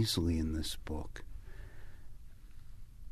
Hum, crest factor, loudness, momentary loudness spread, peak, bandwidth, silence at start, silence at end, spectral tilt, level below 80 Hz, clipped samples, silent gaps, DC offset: none; 18 dB; -37 LUFS; 25 LU; -22 dBFS; 13.5 kHz; 0 s; 0 s; -5 dB/octave; -46 dBFS; under 0.1%; none; under 0.1%